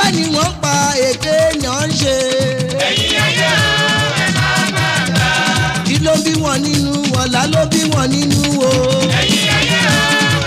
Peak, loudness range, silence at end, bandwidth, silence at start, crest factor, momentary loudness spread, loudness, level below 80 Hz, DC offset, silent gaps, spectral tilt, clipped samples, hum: -6 dBFS; 1 LU; 0 s; 16 kHz; 0 s; 8 dB; 4 LU; -13 LUFS; -36 dBFS; under 0.1%; none; -3.5 dB/octave; under 0.1%; none